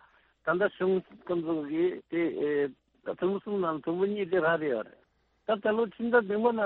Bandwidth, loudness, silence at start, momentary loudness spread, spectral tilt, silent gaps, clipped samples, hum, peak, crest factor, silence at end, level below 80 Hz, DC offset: 4.2 kHz; -30 LUFS; 0.45 s; 8 LU; -5 dB/octave; none; under 0.1%; none; -12 dBFS; 18 dB; 0 s; -70 dBFS; under 0.1%